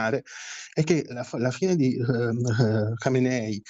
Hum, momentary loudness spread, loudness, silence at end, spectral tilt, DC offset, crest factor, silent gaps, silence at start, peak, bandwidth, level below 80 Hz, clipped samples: none; 8 LU; -25 LUFS; 0 s; -6.5 dB/octave; under 0.1%; 16 dB; none; 0 s; -8 dBFS; 8 kHz; -66 dBFS; under 0.1%